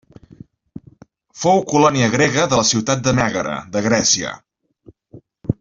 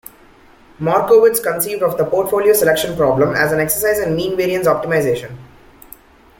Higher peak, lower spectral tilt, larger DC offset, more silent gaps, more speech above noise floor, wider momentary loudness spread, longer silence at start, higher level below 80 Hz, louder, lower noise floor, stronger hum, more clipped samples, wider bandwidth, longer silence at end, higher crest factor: about the same, -2 dBFS vs -2 dBFS; about the same, -3.5 dB/octave vs -4.5 dB/octave; neither; neither; about the same, 33 dB vs 31 dB; first, 11 LU vs 7 LU; about the same, 0.75 s vs 0.8 s; about the same, -48 dBFS vs -46 dBFS; about the same, -16 LUFS vs -15 LUFS; about the same, -49 dBFS vs -46 dBFS; neither; neither; second, 7.8 kHz vs 17 kHz; second, 0.1 s vs 0.95 s; about the same, 18 dB vs 14 dB